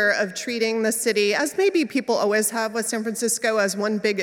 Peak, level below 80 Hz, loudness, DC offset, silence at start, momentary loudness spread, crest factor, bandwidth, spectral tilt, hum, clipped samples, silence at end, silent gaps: -8 dBFS; -74 dBFS; -22 LUFS; under 0.1%; 0 s; 4 LU; 14 dB; 17 kHz; -2.5 dB/octave; none; under 0.1%; 0 s; none